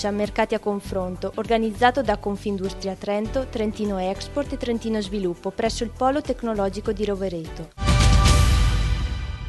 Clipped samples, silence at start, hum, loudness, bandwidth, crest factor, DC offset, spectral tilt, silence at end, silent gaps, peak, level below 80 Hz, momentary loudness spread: under 0.1%; 0 s; none; -24 LUFS; 12 kHz; 18 dB; under 0.1%; -5.5 dB/octave; 0 s; none; -4 dBFS; -28 dBFS; 10 LU